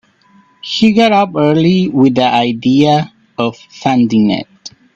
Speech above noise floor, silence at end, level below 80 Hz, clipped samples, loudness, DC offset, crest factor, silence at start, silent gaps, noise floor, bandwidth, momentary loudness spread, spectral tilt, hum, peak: 38 dB; 0.25 s; -52 dBFS; under 0.1%; -12 LUFS; under 0.1%; 12 dB; 0.65 s; none; -49 dBFS; 8 kHz; 10 LU; -6.5 dB/octave; none; 0 dBFS